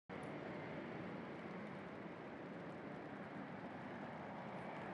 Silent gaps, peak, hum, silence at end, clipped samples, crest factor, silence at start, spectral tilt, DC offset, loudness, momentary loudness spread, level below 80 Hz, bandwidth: none; -36 dBFS; none; 0 s; under 0.1%; 14 dB; 0.1 s; -7.5 dB/octave; under 0.1%; -50 LUFS; 2 LU; -80 dBFS; 11 kHz